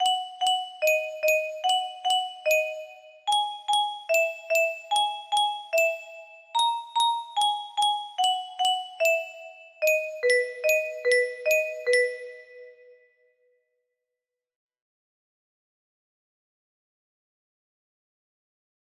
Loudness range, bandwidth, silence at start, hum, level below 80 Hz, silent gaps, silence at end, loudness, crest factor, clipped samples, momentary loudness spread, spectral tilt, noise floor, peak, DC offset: 3 LU; 16 kHz; 0 s; none; -80 dBFS; none; 6.3 s; -25 LUFS; 18 dB; under 0.1%; 8 LU; 3 dB/octave; -88 dBFS; -10 dBFS; under 0.1%